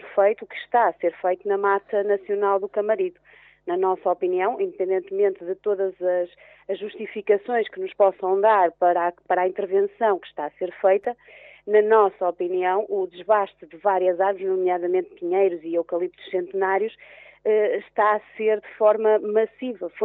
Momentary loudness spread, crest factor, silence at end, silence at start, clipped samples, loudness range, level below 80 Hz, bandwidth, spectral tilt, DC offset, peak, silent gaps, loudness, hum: 10 LU; 16 dB; 0 s; 0.05 s; under 0.1%; 3 LU; -72 dBFS; 4 kHz; -3.5 dB/octave; under 0.1%; -6 dBFS; none; -23 LUFS; none